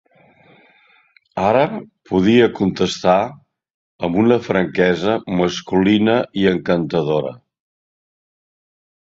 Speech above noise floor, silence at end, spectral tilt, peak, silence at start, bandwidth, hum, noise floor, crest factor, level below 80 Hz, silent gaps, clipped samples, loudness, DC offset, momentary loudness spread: 39 dB; 1.75 s; -6.5 dB/octave; -2 dBFS; 1.35 s; 7.8 kHz; none; -55 dBFS; 18 dB; -50 dBFS; 3.74-3.99 s; under 0.1%; -17 LUFS; under 0.1%; 7 LU